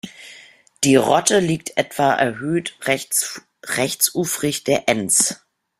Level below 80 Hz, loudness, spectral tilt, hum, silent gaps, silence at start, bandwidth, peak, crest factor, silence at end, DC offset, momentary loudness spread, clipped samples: -60 dBFS; -19 LUFS; -3 dB/octave; none; none; 0.05 s; 16 kHz; 0 dBFS; 20 dB; 0.45 s; under 0.1%; 10 LU; under 0.1%